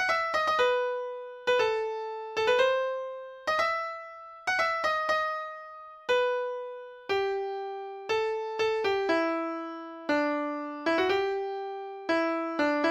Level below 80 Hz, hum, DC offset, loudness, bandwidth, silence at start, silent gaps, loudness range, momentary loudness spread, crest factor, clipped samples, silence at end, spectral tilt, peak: -68 dBFS; none; under 0.1%; -29 LUFS; 14 kHz; 0 s; none; 2 LU; 12 LU; 16 dB; under 0.1%; 0 s; -3 dB/octave; -14 dBFS